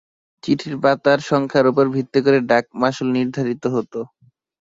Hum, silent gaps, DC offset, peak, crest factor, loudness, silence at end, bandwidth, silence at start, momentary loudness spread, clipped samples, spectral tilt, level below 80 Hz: none; none; under 0.1%; -2 dBFS; 16 dB; -18 LUFS; 0.65 s; 7.8 kHz; 0.45 s; 9 LU; under 0.1%; -6.5 dB/octave; -60 dBFS